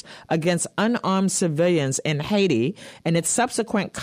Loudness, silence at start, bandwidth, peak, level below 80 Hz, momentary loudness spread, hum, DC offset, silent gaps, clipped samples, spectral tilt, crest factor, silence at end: -22 LUFS; 0.05 s; 15.5 kHz; -8 dBFS; -60 dBFS; 4 LU; none; under 0.1%; none; under 0.1%; -4.5 dB/octave; 14 dB; 0 s